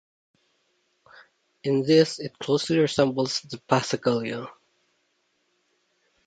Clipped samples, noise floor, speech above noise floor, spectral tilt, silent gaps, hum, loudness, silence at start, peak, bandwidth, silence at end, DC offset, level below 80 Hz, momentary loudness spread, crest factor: under 0.1%; -72 dBFS; 48 dB; -5 dB/octave; none; none; -24 LUFS; 1.65 s; -4 dBFS; 9.4 kHz; 1.75 s; under 0.1%; -66 dBFS; 13 LU; 24 dB